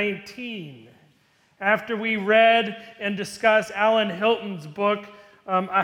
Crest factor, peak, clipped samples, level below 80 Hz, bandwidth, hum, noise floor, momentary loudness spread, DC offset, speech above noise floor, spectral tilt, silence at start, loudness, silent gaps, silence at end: 18 dB; -4 dBFS; under 0.1%; -70 dBFS; 14 kHz; none; -62 dBFS; 16 LU; under 0.1%; 39 dB; -4.5 dB/octave; 0 s; -22 LUFS; none; 0 s